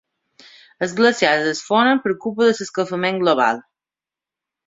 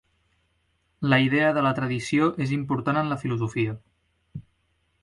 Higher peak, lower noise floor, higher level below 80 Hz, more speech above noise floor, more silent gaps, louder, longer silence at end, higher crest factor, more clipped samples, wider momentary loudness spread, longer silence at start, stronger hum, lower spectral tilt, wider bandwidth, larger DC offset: first, -2 dBFS vs -6 dBFS; first, -89 dBFS vs -70 dBFS; second, -64 dBFS vs -58 dBFS; first, 72 dB vs 46 dB; neither; first, -18 LUFS vs -24 LUFS; first, 1.05 s vs 0.6 s; about the same, 18 dB vs 20 dB; neither; second, 8 LU vs 22 LU; second, 0.8 s vs 1 s; neither; second, -4 dB/octave vs -6.5 dB/octave; second, 7.8 kHz vs 11.5 kHz; neither